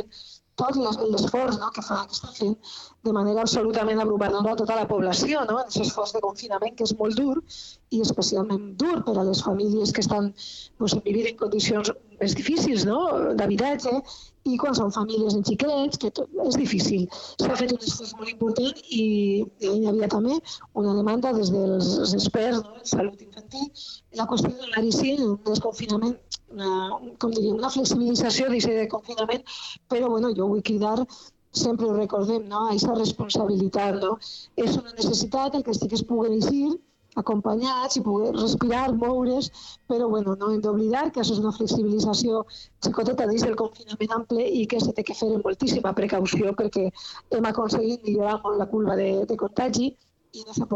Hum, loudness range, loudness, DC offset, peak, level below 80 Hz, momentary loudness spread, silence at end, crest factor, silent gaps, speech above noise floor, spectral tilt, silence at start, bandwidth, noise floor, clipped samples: none; 2 LU; -25 LUFS; under 0.1%; -8 dBFS; -54 dBFS; 7 LU; 0 s; 16 dB; none; 23 dB; -5 dB/octave; 0 s; 8.2 kHz; -48 dBFS; under 0.1%